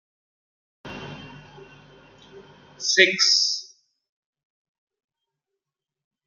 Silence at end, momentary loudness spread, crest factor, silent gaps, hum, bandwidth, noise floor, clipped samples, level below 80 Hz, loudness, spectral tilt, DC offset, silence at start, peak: 2.65 s; 24 LU; 26 dB; none; none; 11.5 kHz; -87 dBFS; under 0.1%; -66 dBFS; -18 LUFS; -0.5 dB/octave; under 0.1%; 0.85 s; -2 dBFS